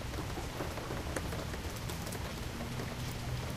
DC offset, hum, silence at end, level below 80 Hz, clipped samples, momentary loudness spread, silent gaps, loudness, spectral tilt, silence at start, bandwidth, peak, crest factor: under 0.1%; none; 0 s; -46 dBFS; under 0.1%; 2 LU; none; -40 LUFS; -4.5 dB/octave; 0 s; 15.5 kHz; -18 dBFS; 22 dB